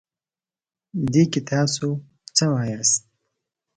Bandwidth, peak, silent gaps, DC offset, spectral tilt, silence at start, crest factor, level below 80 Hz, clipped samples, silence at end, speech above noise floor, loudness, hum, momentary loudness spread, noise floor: 9.6 kHz; -4 dBFS; none; under 0.1%; -4 dB/octave; 0.95 s; 20 dB; -58 dBFS; under 0.1%; 0.8 s; over 69 dB; -21 LUFS; none; 8 LU; under -90 dBFS